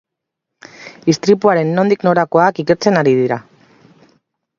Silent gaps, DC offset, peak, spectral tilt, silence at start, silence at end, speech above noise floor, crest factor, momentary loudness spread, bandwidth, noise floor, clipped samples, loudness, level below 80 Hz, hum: none; under 0.1%; 0 dBFS; -6 dB/octave; 0.8 s; 1.2 s; 66 dB; 16 dB; 9 LU; 7.4 kHz; -79 dBFS; under 0.1%; -14 LUFS; -60 dBFS; none